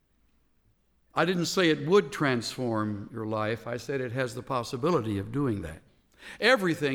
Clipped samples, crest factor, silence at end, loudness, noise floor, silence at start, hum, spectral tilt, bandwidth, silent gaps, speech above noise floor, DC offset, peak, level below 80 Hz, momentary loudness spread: under 0.1%; 20 dB; 0 s; -28 LUFS; -68 dBFS; 1.15 s; none; -5 dB/octave; 18 kHz; none; 40 dB; under 0.1%; -10 dBFS; -58 dBFS; 10 LU